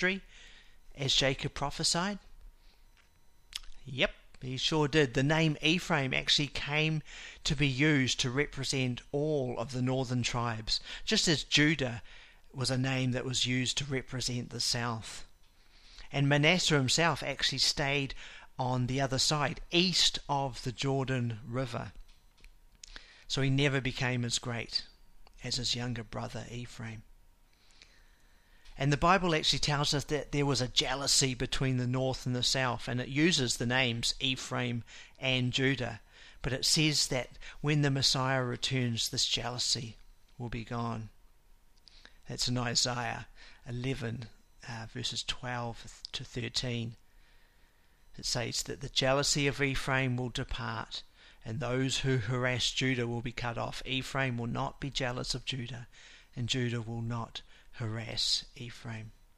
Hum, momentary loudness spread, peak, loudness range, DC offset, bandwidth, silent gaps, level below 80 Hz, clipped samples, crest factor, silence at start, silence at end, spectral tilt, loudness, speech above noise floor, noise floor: none; 17 LU; -10 dBFS; 8 LU; under 0.1%; 14.5 kHz; none; -50 dBFS; under 0.1%; 22 dB; 0 s; 0.25 s; -3.5 dB/octave; -31 LUFS; 31 dB; -62 dBFS